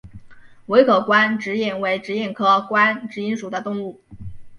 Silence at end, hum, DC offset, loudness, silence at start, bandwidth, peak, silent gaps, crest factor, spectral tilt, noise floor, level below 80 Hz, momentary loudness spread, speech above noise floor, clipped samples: 0 s; none; under 0.1%; -19 LUFS; 0.05 s; 10.5 kHz; -2 dBFS; none; 20 dB; -5.5 dB/octave; -41 dBFS; -52 dBFS; 16 LU; 22 dB; under 0.1%